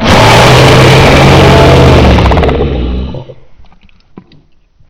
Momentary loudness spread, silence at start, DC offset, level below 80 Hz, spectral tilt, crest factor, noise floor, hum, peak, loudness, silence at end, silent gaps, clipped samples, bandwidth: 13 LU; 0 s; under 0.1%; -14 dBFS; -5.5 dB/octave; 6 dB; -43 dBFS; none; 0 dBFS; -4 LUFS; 1.25 s; none; 9%; 16 kHz